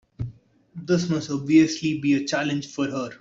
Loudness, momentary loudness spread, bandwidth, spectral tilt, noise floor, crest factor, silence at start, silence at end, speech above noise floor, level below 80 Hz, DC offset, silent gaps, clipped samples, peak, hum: -23 LUFS; 17 LU; 7.8 kHz; -5.5 dB/octave; -46 dBFS; 18 dB; 0.2 s; 0.05 s; 24 dB; -54 dBFS; under 0.1%; none; under 0.1%; -6 dBFS; none